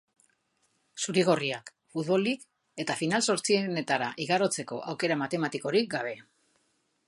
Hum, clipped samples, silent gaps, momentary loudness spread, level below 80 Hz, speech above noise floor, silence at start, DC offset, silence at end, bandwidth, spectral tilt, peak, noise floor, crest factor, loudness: none; under 0.1%; none; 11 LU; -78 dBFS; 45 dB; 0.95 s; under 0.1%; 0.85 s; 11.5 kHz; -4 dB/octave; -10 dBFS; -73 dBFS; 20 dB; -29 LUFS